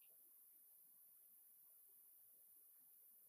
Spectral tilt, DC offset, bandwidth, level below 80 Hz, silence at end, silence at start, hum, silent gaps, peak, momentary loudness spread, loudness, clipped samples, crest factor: 0 dB/octave; under 0.1%; 15.5 kHz; under -90 dBFS; 0 s; 0 s; none; none; -56 dBFS; 0 LU; -66 LUFS; under 0.1%; 12 dB